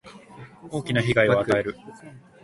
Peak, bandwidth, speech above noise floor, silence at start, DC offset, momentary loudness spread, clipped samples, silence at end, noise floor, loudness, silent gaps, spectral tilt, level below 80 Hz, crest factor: -6 dBFS; 11.5 kHz; 21 dB; 0.05 s; under 0.1%; 24 LU; under 0.1%; 0.25 s; -45 dBFS; -23 LUFS; none; -6 dB/octave; -54 dBFS; 20 dB